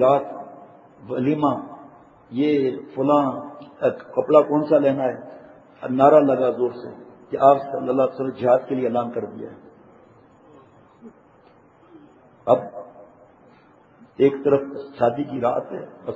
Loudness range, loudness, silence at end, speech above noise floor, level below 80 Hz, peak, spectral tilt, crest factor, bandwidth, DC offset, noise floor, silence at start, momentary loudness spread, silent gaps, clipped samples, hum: 10 LU; -21 LUFS; 0 s; 33 dB; -68 dBFS; 0 dBFS; -8.5 dB/octave; 22 dB; 7.8 kHz; under 0.1%; -53 dBFS; 0 s; 20 LU; none; under 0.1%; none